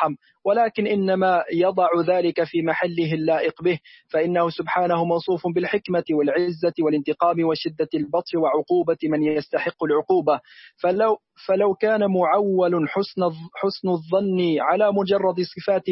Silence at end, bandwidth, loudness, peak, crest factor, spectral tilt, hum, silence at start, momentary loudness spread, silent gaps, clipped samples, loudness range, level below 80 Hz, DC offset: 0 s; 5.8 kHz; -22 LUFS; -6 dBFS; 16 dB; -10.5 dB/octave; none; 0 s; 6 LU; none; under 0.1%; 1 LU; -66 dBFS; under 0.1%